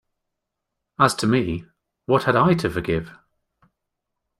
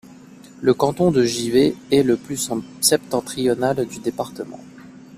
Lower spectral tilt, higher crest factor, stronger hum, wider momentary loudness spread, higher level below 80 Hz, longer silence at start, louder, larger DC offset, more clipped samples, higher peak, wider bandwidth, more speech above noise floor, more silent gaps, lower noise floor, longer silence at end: first, -6 dB/octave vs -4.5 dB/octave; about the same, 22 dB vs 18 dB; neither; first, 20 LU vs 11 LU; about the same, -50 dBFS vs -54 dBFS; first, 1 s vs 0.45 s; about the same, -21 LUFS vs -20 LUFS; neither; neither; about the same, -2 dBFS vs -2 dBFS; about the same, 15 kHz vs 15.5 kHz; first, 61 dB vs 24 dB; neither; first, -81 dBFS vs -43 dBFS; first, 1.25 s vs 0 s